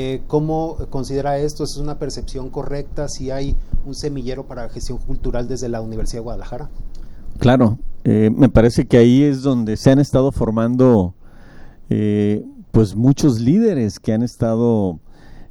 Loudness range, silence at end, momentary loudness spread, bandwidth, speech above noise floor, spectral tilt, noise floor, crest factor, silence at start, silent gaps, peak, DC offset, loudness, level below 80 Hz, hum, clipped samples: 12 LU; 0.05 s; 16 LU; 12.5 kHz; 21 dB; -7.5 dB/octave; -37 dBFS; 16 dB; 0 s; none; 0 dBFS; under 0.1%; -18 LUFS; -28 dBFS; none; under 0.1%